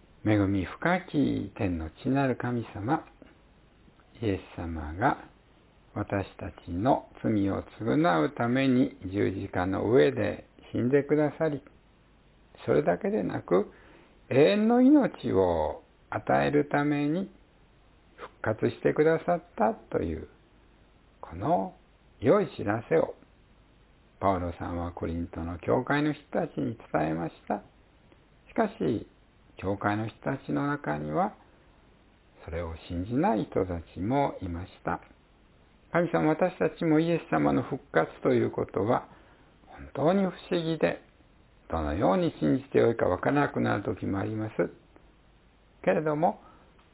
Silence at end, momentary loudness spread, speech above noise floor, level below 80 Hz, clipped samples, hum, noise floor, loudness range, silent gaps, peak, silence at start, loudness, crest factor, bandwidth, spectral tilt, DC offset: 0.55 s; 12 LU; 33 dB; -50 dBFS; under 0.1%; none; -60 dBFS; 7 LU; none; -8 dBFS; 0.25 s; -28 LUFS; 20 dB; 4 kHz; -11 dB/octave; under 0.1%